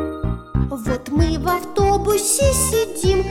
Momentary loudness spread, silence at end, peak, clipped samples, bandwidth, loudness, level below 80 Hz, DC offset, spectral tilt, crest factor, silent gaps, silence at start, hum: 8 LU; 0 s; -4 dBFS; under 0.1%; 17 kHz; -19 LUFS; -28 dBFS; under 0.1%; -4.5 dB/octave; 14 dB; none; 0 s; none